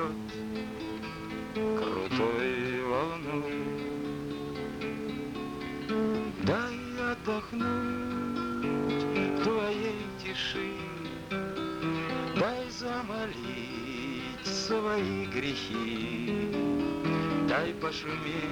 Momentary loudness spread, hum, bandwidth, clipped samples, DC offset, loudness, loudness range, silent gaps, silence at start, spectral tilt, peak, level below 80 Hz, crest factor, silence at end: 8 LU; none; 19 kHz; under 0.1%; under 0.1%; -33 LUFS; 3 LU; none; 0 s; -5.5 dB/octave; -14 dBFS; -56 dBFS; 18 dB; 0 s